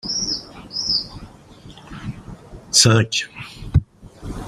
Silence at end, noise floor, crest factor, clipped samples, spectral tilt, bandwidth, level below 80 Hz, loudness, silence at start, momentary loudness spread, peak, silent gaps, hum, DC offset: 0 s; -43 dBFS; 22 dB; under 0.1%; -3 dB/octave; 15 kHz; -38 dBFS; -18 LUFS; 0.05 s; 25 LU; 0 dBFS; none; none; under 0.1%